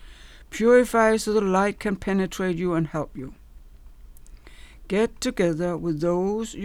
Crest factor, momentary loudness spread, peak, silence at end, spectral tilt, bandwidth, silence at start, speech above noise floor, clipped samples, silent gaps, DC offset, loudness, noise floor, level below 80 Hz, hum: 18 dB; 12 LU; -6 dBFS; 0 s; -6 dB/octave; 16.5 kHz; 0 s; 23 dB; under 0.1%; none; under 0.1%; -23 LUFS; -45 dBFS; -46 dBFS; none